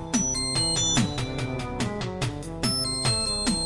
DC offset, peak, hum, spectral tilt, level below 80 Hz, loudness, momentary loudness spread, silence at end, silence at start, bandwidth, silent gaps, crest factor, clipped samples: under 0.1%; -10 dBFS; none; -3 dB/octave; -42 dBFS; -25 LUFS; 8 LU; 0 s; 0 s; 11.5 kHz; none; 16 dB; under 0.1%